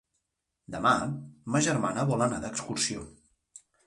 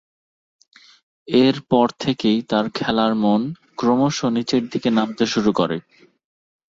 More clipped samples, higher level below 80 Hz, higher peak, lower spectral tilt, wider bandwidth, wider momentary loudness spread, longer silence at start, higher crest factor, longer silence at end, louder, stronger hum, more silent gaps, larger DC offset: neither; about the same, -58 dBFS vs -56 dBFS; second, -10 dBFS vs -2 dBFS; about the same, -4.5 dB/octave vs -5.5 dB/octave; first, 11.5 kHz vs 7.8 kHz; first, 14 LU vs 5 LU; second, 0.7 s vs 1.3 s; about the same, 20 dB vs 18 dB; second, 0.3 s vs 0.9 s; second, -28 LUFS vs -20 LUFS; neither; neither; neither